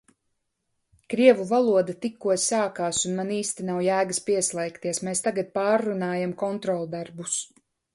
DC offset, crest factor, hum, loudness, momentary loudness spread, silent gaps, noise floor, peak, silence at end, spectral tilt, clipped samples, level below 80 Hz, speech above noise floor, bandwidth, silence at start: under 0.1%; 22 dB; none; -25 LUFS; 9 LU; none; -77 dBFS; -4 dBFS; 0.5 s; -4 dB/octave; under 0.1%; -68 dBFS; 52 dB; 11.5 kHz; 1.1 s